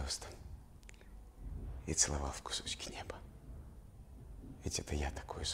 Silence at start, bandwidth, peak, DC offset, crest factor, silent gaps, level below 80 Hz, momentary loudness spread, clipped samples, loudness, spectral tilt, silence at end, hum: 0 s; 16 kHz; -16 dBFS; under 0.1%; 26 dB; none; -48 dBFS; 24 LU; under 0.1%; -39 LUFS; -2.5 dB/octave; 0 s; none